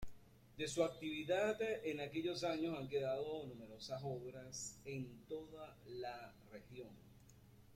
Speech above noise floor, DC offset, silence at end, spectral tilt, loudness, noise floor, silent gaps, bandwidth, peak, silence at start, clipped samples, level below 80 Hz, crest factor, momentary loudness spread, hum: 20 dB; under 0.1%; 0 s; -4.5 dB/octave; -44 LUFS; -64 dBFS; none; 16.5 kHz; -24 dBFS; 0 s; under 0.1%; -68 dBFS; 20 dB; 16 LU; none